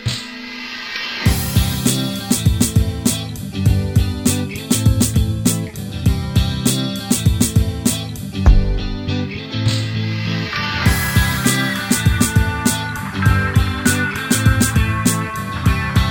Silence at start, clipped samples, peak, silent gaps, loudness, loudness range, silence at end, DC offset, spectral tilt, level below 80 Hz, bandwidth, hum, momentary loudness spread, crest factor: 0 s; under 0.1%; 0 dBFS; none; -18 LUFS; 2 LU; 0 s; 0.1%; -4.5 dB/octave; -24 dBFS; 19.5 kHz; none; 8 LU; 16 dB